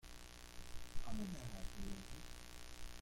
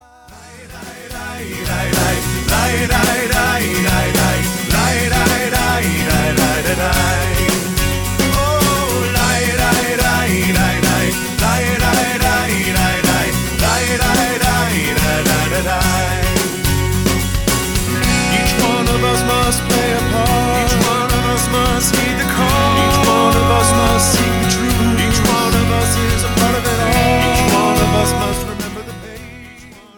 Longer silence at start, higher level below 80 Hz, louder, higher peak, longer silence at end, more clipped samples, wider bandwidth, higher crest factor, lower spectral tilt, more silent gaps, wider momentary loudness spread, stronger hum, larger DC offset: second, 0.05 s vs 0.3 s; second, -52 dBFS vs -24 dBFS; second, -52 LUFS vs -14 LUFS; second, -30 dBFS vs -2 dBFS; second, 0 s vs 0.2 s; neither; second, 16.5 kHz vs 19.5 kHz; about the same, 16 dB vs 14 dB; about the same, -4.5 dB/octave vs -4 dB/octave; neither; first, 8 LU vs 4 LU; first, 60 Hz at -60 dBFS vs none; neither